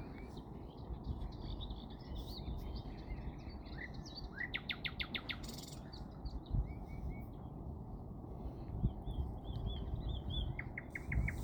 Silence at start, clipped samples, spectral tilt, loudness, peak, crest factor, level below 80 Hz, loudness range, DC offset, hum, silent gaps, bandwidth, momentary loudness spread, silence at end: 0 s; under 0.1%; -6 dB/octave; -45 LUFS; -22 dBFS; 20 dB; -46 dBFS; 4 LU; under 0.1%; none; none; 19.5 kHz; 9 LU; 0 s